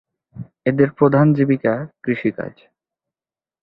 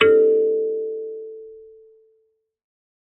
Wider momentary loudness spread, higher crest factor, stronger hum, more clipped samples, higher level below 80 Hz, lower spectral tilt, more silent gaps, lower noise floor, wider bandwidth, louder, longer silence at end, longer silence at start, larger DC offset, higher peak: second, 18 LU vs 24 LU; about the same, 18 dB vs 20 dB; neither; neither; first, -58 dBFS vs -70 dBFS; first, -12 dB/octave vs -1.5 dB/octave; neither; first, under -90 dBFS vs -67 dBFS; first, 4.7 kHz vs 3.9 kHz; about the same, -18 LUFS vs -20 LUFS; second, 1.15 s vs 1.5 s; first, 0.35 s vs 0 s; neither; about the same, -2 dBFS vs -2 dBFS